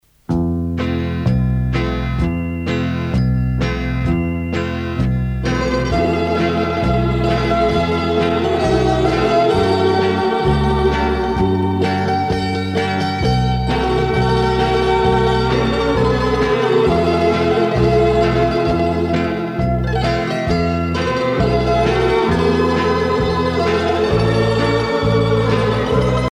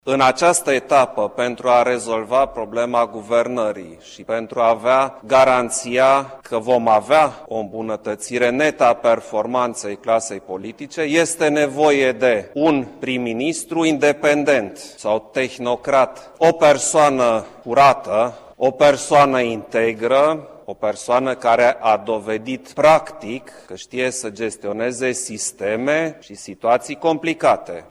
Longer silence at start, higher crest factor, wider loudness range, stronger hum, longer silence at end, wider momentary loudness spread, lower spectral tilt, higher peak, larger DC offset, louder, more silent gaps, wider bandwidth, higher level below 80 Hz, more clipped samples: first, 0.3 s vs 0.05 s; about the same, 12 dB vs 16 dB; about the same, 4 LU vs 4 LU; neither; about the same, 0.05 s vs 0.1 s; second, 5 LU vs 12 LU; first, -7 dB/octave vs -4 dB/octave; about the same, -4 dBFS vs -2 dBFS; neither; about the same, -17 LUFS vs -18 LUFS; neither; second, 10.5 kHz vs 14 kHz; first, -28 dBFS vs -56 dBFS; neither